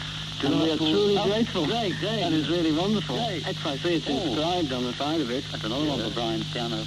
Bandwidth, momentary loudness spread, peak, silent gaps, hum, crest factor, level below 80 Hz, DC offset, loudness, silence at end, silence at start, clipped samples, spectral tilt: 13.5 kHz; 6 LU; -12 dBFS; none; none; 14 dB; -50 dBFS; under 0.1%; -26 LUFS; 0 s; 0 s; under 0.1%; -5 dB/octave